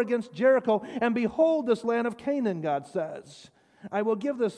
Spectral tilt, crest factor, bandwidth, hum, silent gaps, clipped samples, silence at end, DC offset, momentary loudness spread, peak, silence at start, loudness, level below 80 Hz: -6.5 dB/octave; 16 dB; 10.5 kHz; none; none; under 0.1%; 0 s; under 0.1%; 10 LU; -12 dBFS; 0 s; -27 LUFS; -70 dBFS